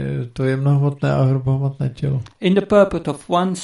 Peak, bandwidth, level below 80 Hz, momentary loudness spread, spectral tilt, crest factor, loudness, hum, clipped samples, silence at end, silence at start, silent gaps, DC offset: -2 dBFS; 11.5 kHz; -46 dBFS; 8 LU; -7.5 dB/octave; 16 dB; -19 LUFS; none; under 0.1%; 0 s; 0 s; none; under 0.1%